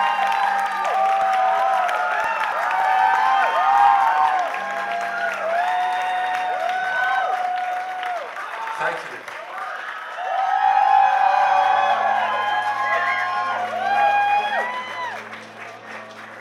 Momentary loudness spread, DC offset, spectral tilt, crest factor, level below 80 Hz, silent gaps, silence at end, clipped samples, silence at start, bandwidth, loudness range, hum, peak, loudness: 13 LU; under 0.1%; -1.5 dB/octave; 16 dB; -72 dBFS; none; 0 s; under 0.1%; 0 s; 13.5 kHz; 6 LU; none; -4 dBFS; -20 LUFS